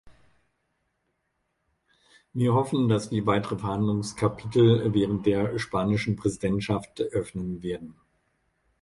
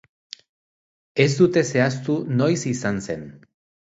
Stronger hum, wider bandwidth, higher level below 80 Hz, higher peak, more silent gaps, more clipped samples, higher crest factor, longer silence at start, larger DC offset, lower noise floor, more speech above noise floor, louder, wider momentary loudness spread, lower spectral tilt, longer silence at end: neither; first, 11.5 kHz vs 8 kHz; first, -52 dBFS vs -58 dBFS; second, -8 dBFS vs -4 dBFS; neither; neither; about the same, 20 dB vs 18 dB; second, 0.05 s vs 1.15 s; neither; second, -76 dBFS vs under -90 dBFS; second, 51 dB vs over 70 dB; second, -26 LUFS vs -21 LUFS; second, 11 LU vs 24 LU; about the same, -7 dB/octave vs -6 dB/octave; first, 0.9 s vs 0.6 s